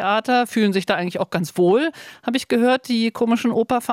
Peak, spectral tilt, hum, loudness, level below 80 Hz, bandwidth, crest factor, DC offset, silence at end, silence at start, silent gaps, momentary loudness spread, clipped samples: -6 dBFS; -5.5 dB/octave; none; -20 LUFS; -62 dBFS; 16 kHz; 12 dB; under 0.1%; 0 s; 0 s; none; 6 LU; under 0.1%